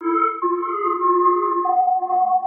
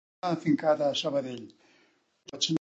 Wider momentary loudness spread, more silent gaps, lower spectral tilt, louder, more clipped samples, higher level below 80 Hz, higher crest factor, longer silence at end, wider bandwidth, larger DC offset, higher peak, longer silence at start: second, 5 LU vs 16 LU; neither; first, -8.5 dB/octave vs -4.5 dB/octave; first, -19 LUFS vs -29 LUFS; neither; second, -84 dBFS vs -76 dBFS; second, 12 dB vs 18 dB; about the same, 0 s vs 0.05 s; second, 3.3 kHz vs 8.2 kHz; neither; first, -6 dBFS vs -12 dBFS; second, 0 s vs 0.25 s